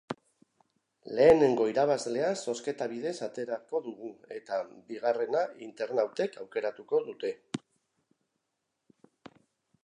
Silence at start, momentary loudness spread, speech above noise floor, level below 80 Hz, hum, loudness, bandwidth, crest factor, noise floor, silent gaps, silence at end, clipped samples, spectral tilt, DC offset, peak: 0.1 s; 18 LU; 53 dB; -68 dBFS; none; -30 LUFS; 11 kHz; 22 dB; -83 dBFS; none; 2.3 s; under 0.1%; -5 dB/octave; under 0.1%; -8 dBFS